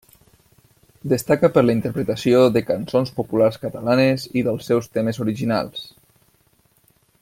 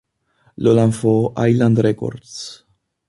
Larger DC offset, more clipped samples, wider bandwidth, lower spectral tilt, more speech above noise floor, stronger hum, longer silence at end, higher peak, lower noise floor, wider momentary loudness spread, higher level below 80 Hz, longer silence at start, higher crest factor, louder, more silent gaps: neither; neither; first, 16.5 kHz vs 11.5 kHz; about the same, -6.5 dB/octave vs -7.5 dB/octave; about the same, 41 dB vs 44 dB; neither; first, 1.35 s vs 0.55 s; about the same, -2 dBFS vs -2 dBFS; about the same, -60 dBFS vs -60 dBFS; second, 8 LU vs 17 LU; about the same, -56 dBFS vs -52 dBFS; first, 1.05 s vs 0.6 s; about the same, 18 dB vs 16 dB; second, -20 LUFS vs -17 LUFS; neither